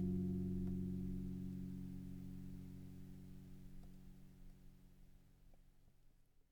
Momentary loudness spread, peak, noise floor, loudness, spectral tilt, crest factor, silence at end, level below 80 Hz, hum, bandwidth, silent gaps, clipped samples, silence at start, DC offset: 22 LU; -32 dBFS; -69 dBFS; -48 LUFS; -9.5 dB/octave; 16 dB; 0.1 s; -58 dBFS; none; 19 kHz; none; under 0.1%; 0 s; under 0.1%